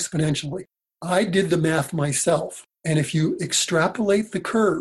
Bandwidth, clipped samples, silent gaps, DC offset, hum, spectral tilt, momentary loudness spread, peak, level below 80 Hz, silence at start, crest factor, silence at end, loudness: 13 kHz; under 0.1%; none; under 0.1%; none; -4.5 dB/octave; 10 LU; -8 dBFS; -56 dBFS; 0 s; 16 dB; 0 s; -22 LUFS